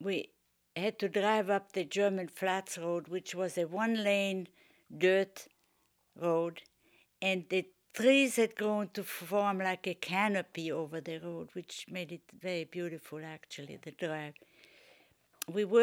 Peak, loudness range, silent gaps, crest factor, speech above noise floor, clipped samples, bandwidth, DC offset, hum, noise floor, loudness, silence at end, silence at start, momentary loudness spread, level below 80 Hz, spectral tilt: -14 dBFS; 10 LU; none; 20 dB; 41 dB; under 0.1%; over 20 kHz; under 0.1%; none; -74 dBFS; -33 LUFS; 0 s; 0 s; 16 LU; -86 dBFS; -4.5 dB/octave